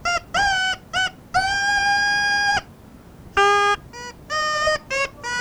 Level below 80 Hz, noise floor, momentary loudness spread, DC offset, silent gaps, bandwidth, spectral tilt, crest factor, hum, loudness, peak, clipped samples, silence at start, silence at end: -46 dBFS; -44 dBFS; 7 LU; under 0.1%; none; over 20 kHz; -1.5 dB/octave; 14 dB; none; -20 LUFS; -8 dBFS; under 0.1%; 0 s; 0 s